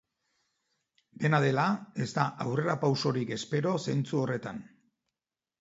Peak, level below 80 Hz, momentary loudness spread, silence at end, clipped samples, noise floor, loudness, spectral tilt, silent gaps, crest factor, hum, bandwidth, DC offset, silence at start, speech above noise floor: -10 dBFS; -72 dBFS; 7 LU; 0.95 s; under 0.1%; under -90 dBFS; -30 LUFS; -6.5 dB/octave; none; 20 dB; none; 8 kHz; under 0.1%; 1.2 s; over 61 dB